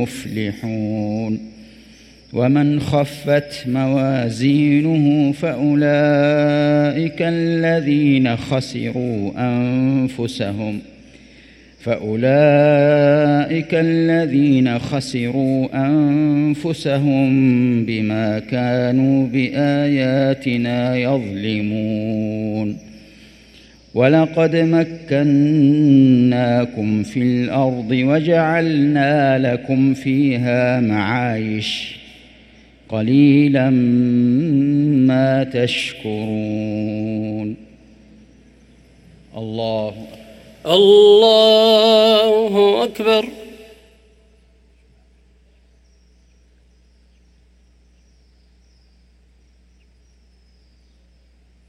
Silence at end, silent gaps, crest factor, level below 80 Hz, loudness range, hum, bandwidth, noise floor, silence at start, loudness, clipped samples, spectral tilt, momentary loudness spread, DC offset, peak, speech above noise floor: 8.05 s; none; 16 dB; -52 dBFS; 8 LU; none; 13.5 kHz; -53 dBFS; 0 s; -16 LUFS; under 0.1%; -7 dB/octave; 11 LU; under 0.1%; 0 dBFS; 37 dB